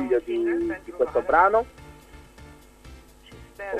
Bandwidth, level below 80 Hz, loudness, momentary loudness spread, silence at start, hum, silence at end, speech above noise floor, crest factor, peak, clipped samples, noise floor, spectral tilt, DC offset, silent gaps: 13.5 kHz; -50 dBFS; -23 LUFS; 14 LU; 0 s; none; 0 s; 25 dB; 20 dB; -4 dBFS; under 0.1%; -48 dBFS; -6.5 dB/octave; under 0.1%; none